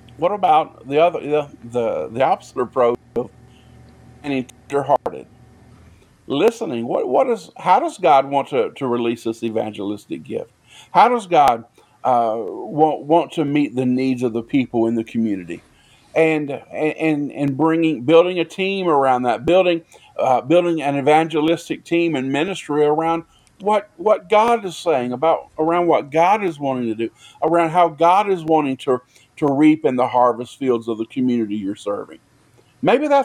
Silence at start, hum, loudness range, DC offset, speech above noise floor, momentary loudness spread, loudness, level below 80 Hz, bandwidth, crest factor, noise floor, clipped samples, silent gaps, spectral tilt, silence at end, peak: 0.2 s; none; 5 LU; under 0.1%; 36 dB; 11 LU; -19 LUFS; -60 dBFS; 14.5 kHz; 18 dB; -54 dBFS; under 0.1%; none; -6 dB/octave; 0 s; 0 dBFS